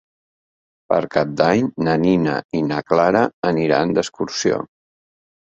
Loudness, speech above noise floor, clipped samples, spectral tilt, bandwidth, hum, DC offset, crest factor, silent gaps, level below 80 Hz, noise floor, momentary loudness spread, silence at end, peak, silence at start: -19 LUFS; over 72 dB; under 0.1%; -5.5 dB/octave; 8 kHz; none; under 0.1%; 18 dB; 2.45-2.49 s, 3.33-3.42 s; -54 dBFS; under -90 dBFS; 5 LU; 0.85 s; -2 dBFS; 0.9 s